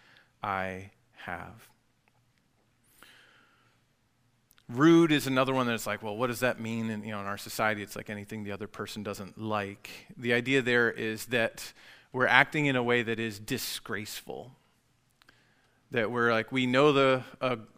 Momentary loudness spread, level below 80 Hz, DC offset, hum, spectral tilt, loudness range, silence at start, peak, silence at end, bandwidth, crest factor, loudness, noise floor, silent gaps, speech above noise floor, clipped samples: 18 LU; -64 dBFS; under 0.1%; none; -5 dB/octave; 12 LU; 0.45 s; -4 dBFS; 0.1 s; 16 kHz; 28 dB; -29 LUFS; -71 dBFS; none; 42 dB; under 0.1%